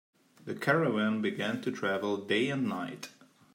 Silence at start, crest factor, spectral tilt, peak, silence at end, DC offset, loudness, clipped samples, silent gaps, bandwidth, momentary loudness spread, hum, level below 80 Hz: 0.45 s; 20 dB; -6 dB/octave; -12 dBFS; 0.45 s; under 0.1%; -31 LUFS; under 0.1%; none; 16 kHz; 15 LU; none; -80 dBFS